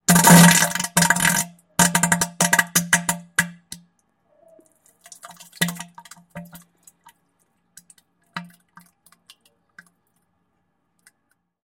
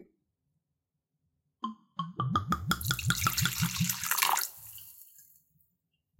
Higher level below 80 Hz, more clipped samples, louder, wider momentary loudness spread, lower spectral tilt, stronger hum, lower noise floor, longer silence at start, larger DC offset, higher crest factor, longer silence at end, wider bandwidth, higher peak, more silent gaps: about the same, -56 dBFS vs -56 dBFS; neither; first, -17 LUFS vs -30 LUFS; first, 29 LU vs 18 LU; about the same, -3 dB/octave vs -2.5 dB/octave; neither; second, -71 dBFS vs -85 dBFS; about the same, 0.1 s vs 0 s; neither; second, 22 dB vs 28 dB; first, 3.2 s vs 1 s; about the same, 16.5 kHz vs 17 kHz; first, 0 dBFS vs -6 dBFS; neither